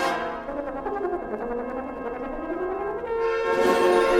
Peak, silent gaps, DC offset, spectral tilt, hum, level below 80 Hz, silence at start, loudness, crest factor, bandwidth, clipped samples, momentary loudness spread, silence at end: -8 dBFS; none; under 0.1%; -4.5 dB/octave; none; -48 dBFS; 0 s; -26 LUFS; 18 dB; 15.5 kHz; under 0.1%; 12 LU; 0 s